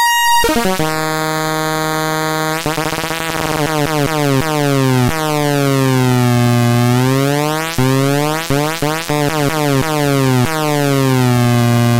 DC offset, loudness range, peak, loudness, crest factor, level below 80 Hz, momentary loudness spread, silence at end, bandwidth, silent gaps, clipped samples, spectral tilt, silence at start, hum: under 0.1%; 3 LU; -2 dBFS; -14 LUFS; 12 dB; -38 dBFS; 4 LU; 0 s; 16.5 kHz; none; under 0.1%; -5 dB/octave; 0 s; none